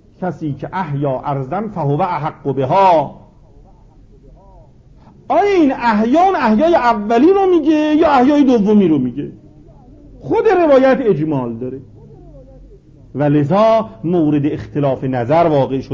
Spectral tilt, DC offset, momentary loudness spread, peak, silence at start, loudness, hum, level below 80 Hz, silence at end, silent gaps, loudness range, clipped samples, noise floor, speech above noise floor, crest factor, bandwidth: -8 dB/octave; under 0.1%; 12 LU; -2 dBFS; 0.2 s; -14 LUFS; none; -44 dBFS; 0 s; none; 6 LU; under 0.1%; -43 dBFS; 30 dB; 14 dB; 7.4 kHz